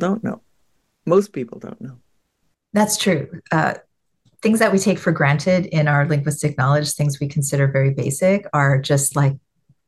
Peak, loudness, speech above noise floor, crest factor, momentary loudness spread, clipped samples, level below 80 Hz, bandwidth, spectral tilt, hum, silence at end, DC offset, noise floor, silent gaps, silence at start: -2 dBFS; -19 LUFS; 51 dB; 18 dB; 15 LU; under 0.1%; -58 dBFS; 12.5 kHz; -5.5 dB/octave; none; 0.5 s; under 0.1%; -69 dBFS; none; 0 s